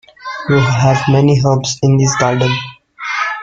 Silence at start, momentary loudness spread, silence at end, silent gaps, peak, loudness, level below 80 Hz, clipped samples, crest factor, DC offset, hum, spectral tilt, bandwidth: 0.2 s; 13 LU; 0 s; none; 0 dBFS; -13 LUFS; -44 dBFS; under 0.1%; 12 dB; under 0.1%; none; -5.5 dB/octave; 7.8 kHz